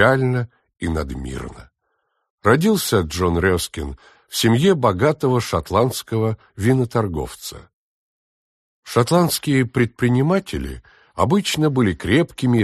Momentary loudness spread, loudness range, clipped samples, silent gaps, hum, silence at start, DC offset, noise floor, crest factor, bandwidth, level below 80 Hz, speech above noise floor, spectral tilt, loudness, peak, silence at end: 14 LU; 4 LU; under 0.1%; 2.30-2.38 s, 7.73-8.83 s; none; 0 s; under 0.1%; -71 dBFS; 18 dB; 13 kHz; -40 dBFS; 53 dB; -5.5 dB/octave; -19 LUFS; -2 dBFS; 0 s